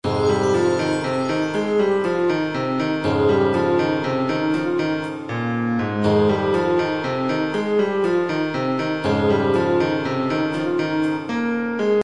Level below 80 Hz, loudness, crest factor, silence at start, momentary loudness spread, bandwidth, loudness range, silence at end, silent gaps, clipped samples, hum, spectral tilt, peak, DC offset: -56 dBFS; -21 LUFS; 14 dB; 0.05 s; 4 LU; 11 kHz; 1 LU; 0 s; none; under 0.1%; none; -6.5 dB/octave; -6 dBFS; 0.3%